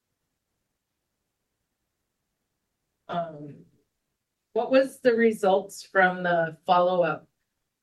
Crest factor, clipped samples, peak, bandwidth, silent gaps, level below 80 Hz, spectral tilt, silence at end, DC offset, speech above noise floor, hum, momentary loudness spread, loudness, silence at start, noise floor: 20 dB; under 0.1%; -8 dBFS; 12.5 kHz; none; -78 dBFS; -5.5 dB/octave; 0.65 s; under 0.1%; 57 dB; none; 12 LU; -24 LUFS; 3.1 s; -81 dBFS